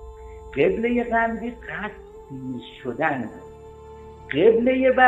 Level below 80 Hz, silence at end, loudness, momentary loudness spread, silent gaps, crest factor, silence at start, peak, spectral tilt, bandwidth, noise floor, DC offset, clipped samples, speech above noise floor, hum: -46 dBFS; 0 s; -23 LUFS; 24 LU; none; 22 dB; 0 s; -2 dBFS; -7.5 dB/octave; 8 kHz; -42 dBFS; under 0.1%; under 0.1%; 21 dB; none